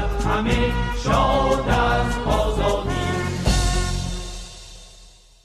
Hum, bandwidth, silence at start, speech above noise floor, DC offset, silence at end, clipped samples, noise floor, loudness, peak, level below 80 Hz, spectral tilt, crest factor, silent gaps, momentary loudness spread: none; 13.5 kHz; 0 s; 28 dB; under 0.1%; 0.4 s; under 0.1%; -48 dBFS; -21 LUFS; -6 dBFS; -26 dBFS; -5 dB/octave; 14 dB; none; 14 LU